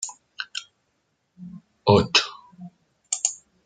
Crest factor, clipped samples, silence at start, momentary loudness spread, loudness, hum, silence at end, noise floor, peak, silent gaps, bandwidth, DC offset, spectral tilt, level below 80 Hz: 24 dB; under 0.1%; 0 s; 25 LU; -23 LUFS; none; 0.3 s; -72 dBFS; -2 dBFS; none; 10 kHz; under 0.1%; -3 dB/octave; -58 dBFS